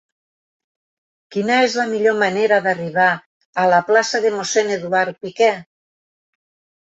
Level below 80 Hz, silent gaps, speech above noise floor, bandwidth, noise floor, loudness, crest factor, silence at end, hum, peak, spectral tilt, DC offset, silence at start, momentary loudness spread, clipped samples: -68 dBFS; 3.26-3.53 s; over 73 dB; 8.2 kHz; under -90 dBFS; -17 LUFS; 18 dB; 1.25 s; none; -2 dBFS; -3.5 dB/octave; under 0.1%; 1.3 s; 8 LU; under 0.1%